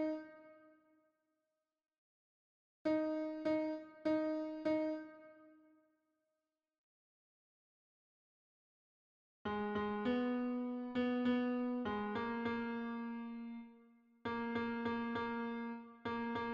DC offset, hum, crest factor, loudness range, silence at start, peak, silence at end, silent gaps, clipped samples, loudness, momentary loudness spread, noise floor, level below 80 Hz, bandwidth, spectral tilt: under 0.1%; none; 16 dB; 7 LU; 0 s; -26 dBFS; 0 s; 1.98-2.85 s, 6.78-9.45 s; under 0.1%; -40 LUFS; 11 LU; under -90 dBFS; -74 dBFS; 6.8 kHz; -7.5 dB/octave